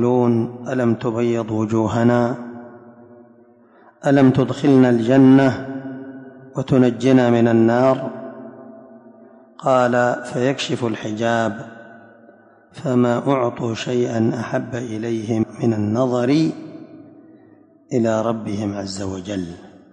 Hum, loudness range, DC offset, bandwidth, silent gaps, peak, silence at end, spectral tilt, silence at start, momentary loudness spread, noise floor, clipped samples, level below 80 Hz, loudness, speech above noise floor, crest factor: none; 6 LU; under 0.1%; 9.6 kHz; none; -4 dBFS; 0.25 s; -7 dB/octave; 0 s; 17 LU; -50 dBFS; under 0.1%; -54 dBFS; -18 LUFS; 33 dB; 16 dB